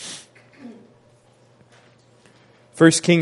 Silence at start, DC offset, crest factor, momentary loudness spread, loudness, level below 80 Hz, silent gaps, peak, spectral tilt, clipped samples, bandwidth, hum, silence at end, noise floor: 0 s; under 0.1%; 22 dB; 28 LU; -16 LUFS; -68 dBFS; none; 0 dBFS; -4.5 dB/octave; under 0.1%; 11.5 kHz; none; 0 s; -55 dBFS